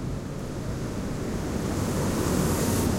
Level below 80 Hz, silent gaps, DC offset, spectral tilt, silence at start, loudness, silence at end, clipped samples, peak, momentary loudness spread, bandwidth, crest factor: -38 dBFS; none; under 0.1%; -5.5 dB/octave; 0 s; -28 LUFS; 0 s; under 0.1%; -14 dBFS; 9 LU; 16 kHz; 14 dB